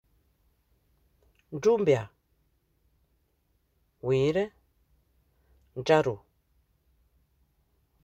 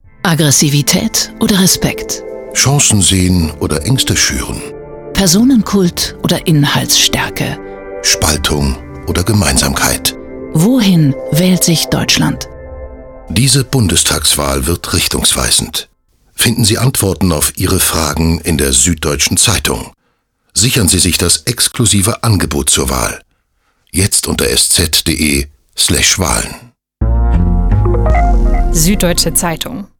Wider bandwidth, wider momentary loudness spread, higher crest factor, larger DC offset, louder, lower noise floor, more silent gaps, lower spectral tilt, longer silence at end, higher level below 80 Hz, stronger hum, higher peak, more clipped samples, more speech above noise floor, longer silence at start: second, 8.2 kHz vs 19.5 kHz; first, 18 LU vs 11 LU; first, 22 dB vs 12 dB; neither; second, -27 LUFS vs -11 LUFS; first, -72 dBFS vs -62 dBFS; neither; first, -6.5 dB/octave vs -3.5 dB/octave; first, 1.85 s vs 0.15 s; second, -64 dBFS vs -22 dBFS; neither; second, -10 dBFS vs 0 dBFS; neither; about the same, 47 dB vs 50 dB; first, 1.5 s vs 0.25 s